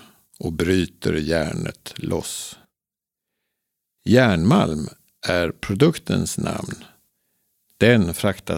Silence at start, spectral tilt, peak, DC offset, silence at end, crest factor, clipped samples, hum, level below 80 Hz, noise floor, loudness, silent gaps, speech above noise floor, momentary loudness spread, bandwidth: 0.4 s; -5.5 dB/octave; 0 dBFS; under 0.1%; 0 s; 22 dB; under 0.1%; none; -46 dBFS; -88 dBFS; -21 LUFS; none; 68 dB; 15 LU; 17 kHz